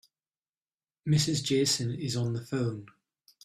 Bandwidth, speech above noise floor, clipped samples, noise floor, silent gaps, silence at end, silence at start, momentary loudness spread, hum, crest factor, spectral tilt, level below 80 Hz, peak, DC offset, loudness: 14.5 kHz; over 61 dB; under 0.1%; under -90 dBFS; none; 0.6 s; 1.05 s; 9 LU; none; 18 dB; -4.5 dB/octave; -62 dBFS; -14 dBFS; under 0.1%; -29 LUFS